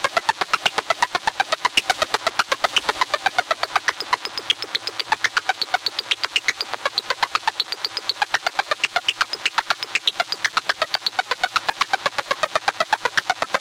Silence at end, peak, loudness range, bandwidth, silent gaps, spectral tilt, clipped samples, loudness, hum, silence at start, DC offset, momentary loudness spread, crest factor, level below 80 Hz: 0 s; -4 dBFS; 1 LU; 17 kHz; none; 0 dB/octave; under 0.1%; -21 LUFS; none; 0 s; under 0.1%; 3 LU; 20 dB; -60 dBFS